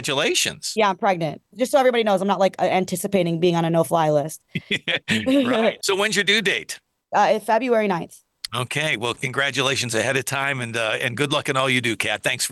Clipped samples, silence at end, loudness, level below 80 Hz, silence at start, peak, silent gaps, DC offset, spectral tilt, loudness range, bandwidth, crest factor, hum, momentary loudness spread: under 0.1%; 0 s; -21 LUFS; -64 dBFS; 0 s; -6 dBFS; none; under 0.1%; -3.5 dB/octave; 2 LU; 13 kHz; 16 dB; none; 7 LU